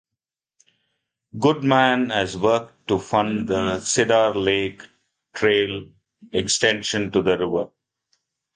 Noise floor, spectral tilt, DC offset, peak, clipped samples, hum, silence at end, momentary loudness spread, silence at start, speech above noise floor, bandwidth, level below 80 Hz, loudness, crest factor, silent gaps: -86 dBFS; -4 dB/octave; under 0.1%; -4 dBFS; under 0.1%; none; 0.9 s; 9 LU; 1.35 s; 66 dB; 10 kHz; -52 dBFS; -21 LUFS; 18 dB; none